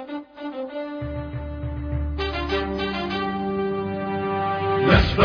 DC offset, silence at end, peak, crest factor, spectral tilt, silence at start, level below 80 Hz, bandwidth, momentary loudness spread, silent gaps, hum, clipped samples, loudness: under 0.1%; 0 s; -4 dBFS; 20 dB; -7.5 dB/octave; 0 s; -32 dBFS; 5.4 kHz; 12 LU; none; none; under 0.1%; -25 LUFS